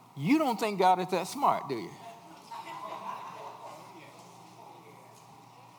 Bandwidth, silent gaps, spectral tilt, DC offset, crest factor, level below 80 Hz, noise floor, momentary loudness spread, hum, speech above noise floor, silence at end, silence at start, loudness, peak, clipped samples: over 20 kHz; none; -5.5 dB/octave; under 0.1%; 22 dB; -88 dBFS; -54 dBFS; 25 LU; none; 25 dB; 0.1 s; 0.15 s; -30 LUFS; -12 dBFS; under 0.1%